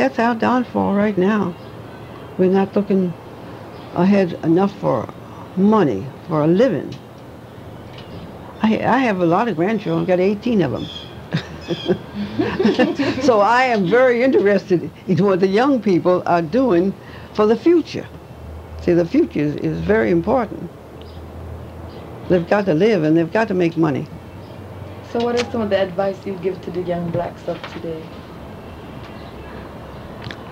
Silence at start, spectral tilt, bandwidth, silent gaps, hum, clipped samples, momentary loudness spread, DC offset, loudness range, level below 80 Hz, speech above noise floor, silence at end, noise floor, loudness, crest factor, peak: 0 s; -7.5 dB/octave; 10 kHz; none; none; under 0.1%; 20 LU; under 0.1%; 7 LU; -46 dBFS; 20 dB; 0 s; -37 dBFS; -18 LUFS; 16 dB; -2 dBFS